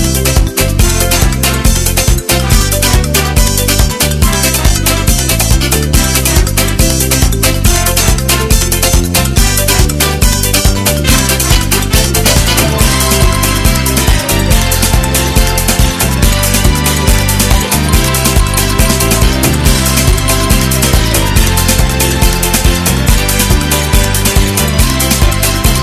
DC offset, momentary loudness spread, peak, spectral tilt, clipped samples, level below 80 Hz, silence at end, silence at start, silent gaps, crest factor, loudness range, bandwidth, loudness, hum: under 0.1%; 2 LU; 0 dBFS; -3.5 dB/octave; 0.8%; -14 dBFS; 0 s; 0 s; none; 10 dB; 1 LU; 15 kHz; -10 LUFS; none